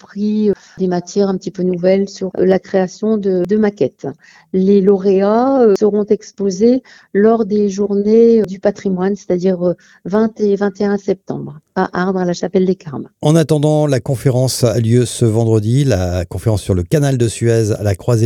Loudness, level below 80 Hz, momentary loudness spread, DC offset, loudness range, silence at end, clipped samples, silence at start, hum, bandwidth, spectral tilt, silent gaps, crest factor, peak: -15 LUFS; -44 dBFS; 8 LU; under 0.1%; 4 LU; 0 s; under 0.1%; 0.15 s; none; 15 kHz; -7 dB/octave; none; 14 dB; 0 dBFS